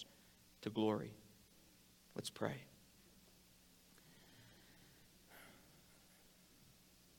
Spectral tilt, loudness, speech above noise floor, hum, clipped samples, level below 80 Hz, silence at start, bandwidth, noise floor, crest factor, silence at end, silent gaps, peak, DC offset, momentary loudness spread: -5 dB/octave; -45 LUFS; 26 dB; none; under 0.1%; -78 dBFS; 0 s; 17.5 kHz; -68 dBFS; 26 dB; 1.5 s; none; -24 dBFS; under 0.1%; 24 LU